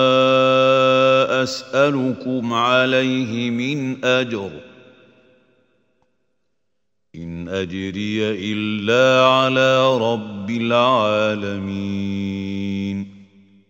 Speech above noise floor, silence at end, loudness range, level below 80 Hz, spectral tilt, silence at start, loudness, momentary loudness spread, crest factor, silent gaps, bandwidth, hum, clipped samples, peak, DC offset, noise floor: 59 dB; 0.45 s; 12 LU; -60 dBFS; -5.5 dB/octave; 0 s; -18 LUFS; 12 LU; 18 dB; none; 15.5 kHz; none; under 0.1%; -2 dBFS; under 0.1%; -78 dBFS